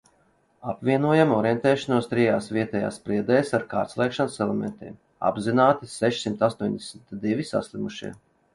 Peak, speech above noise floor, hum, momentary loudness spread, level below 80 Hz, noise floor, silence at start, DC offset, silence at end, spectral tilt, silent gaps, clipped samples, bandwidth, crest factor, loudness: -6 dBFS; 40 dB; none; 14 LU; -60 dBFS; -64 dBFS; 0.65 s; under 0.1%; 0.4 s; -6 dB/octave; none; under 0.1%; 11.5 kHz; 20 dB; -24 LUFS